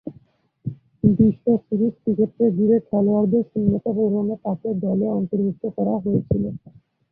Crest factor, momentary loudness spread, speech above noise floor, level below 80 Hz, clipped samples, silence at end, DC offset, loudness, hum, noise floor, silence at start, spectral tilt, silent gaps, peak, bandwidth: 18 dB; 11 LU; 34 dB; -48 dBFS; under 0.1%; 0.4 s; under 0.1%; -21 LUFS; none; -54 dBFS; 0.05 s; -15 dB/octave; none; -2 dBFS; 2 kHz